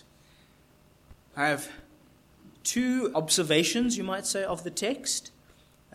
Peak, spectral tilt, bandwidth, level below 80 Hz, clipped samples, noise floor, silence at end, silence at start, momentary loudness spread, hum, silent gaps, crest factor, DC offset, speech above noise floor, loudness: -10 dBFS; -2.5 dB/octave; 16 kHz; -62 dBFS; under 0.1%; -60 dBFS; 0.65 s; 1.1 s; 9 LU; none; none; 20 dB; under 0.1%; 32 dB; -28 LUFS